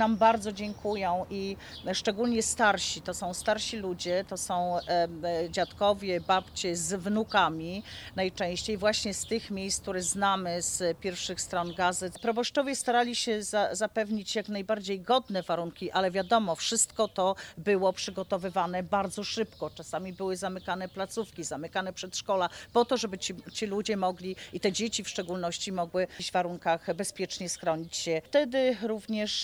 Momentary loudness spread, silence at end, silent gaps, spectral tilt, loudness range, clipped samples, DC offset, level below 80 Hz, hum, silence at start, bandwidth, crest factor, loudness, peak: 8 LU; 0 s; none; -3 dB/octave; 3 LU; under 0.1%; under 0.1%; -58 dBFS; none; 0 s; over 20 kHz; 20 dB; -30 LUFS; -10 dBFS